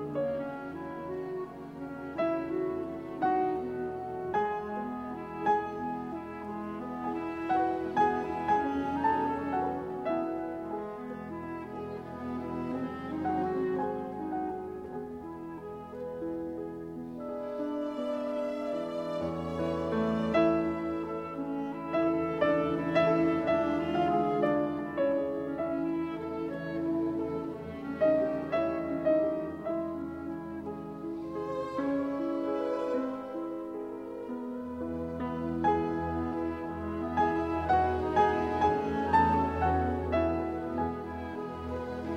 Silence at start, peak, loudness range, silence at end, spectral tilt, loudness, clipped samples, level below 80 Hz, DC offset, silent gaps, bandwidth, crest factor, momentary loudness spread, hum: 0 s; -14 dBFS; 7 LU; 0 s; -8 dB/octave; -32 LUFS; under 0.1%; -54 dBFS; under 0.1%; none; 9 kHz; 18 dB; 12 LU; none